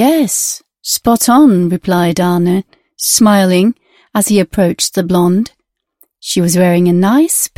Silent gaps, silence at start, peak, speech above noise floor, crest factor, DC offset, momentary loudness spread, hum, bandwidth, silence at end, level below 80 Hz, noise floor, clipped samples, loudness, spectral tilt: none; 0 s; 0 dBFS; 43 dB; 12 dB; 0.2%; 9 LU; none; 16.5 kHz; 0.1 s; -44 dBFS; -54 dBFS; under 0.1%; -11 LUFS; -4.5 dB/octave